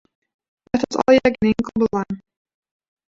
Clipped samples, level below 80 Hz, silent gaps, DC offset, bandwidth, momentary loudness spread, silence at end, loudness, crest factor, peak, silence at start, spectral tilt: under 0.1%; -50 dBFS; none; under 0.1%; 7.6 kHz; 12 LU; 0.9 s; -19 LUFS; 20 dB; -2 dBFS; 0.75 s; -6 dB/octave